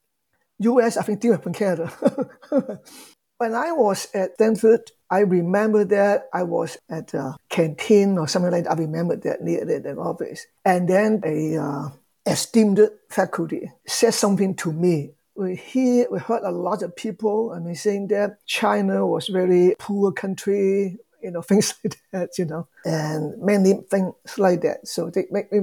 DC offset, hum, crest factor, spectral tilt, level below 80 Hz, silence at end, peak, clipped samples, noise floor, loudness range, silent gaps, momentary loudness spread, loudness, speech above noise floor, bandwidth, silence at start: under 0.1%; none; 16 dB; -5.5 dB/octave; -72 dBFS; 0 s; -4 dBFS; under 0.1%; -73 dBFS; 3 LU; none; 11 LU; -22 LUFS; 52 dB; 19 kHz; 0.6 s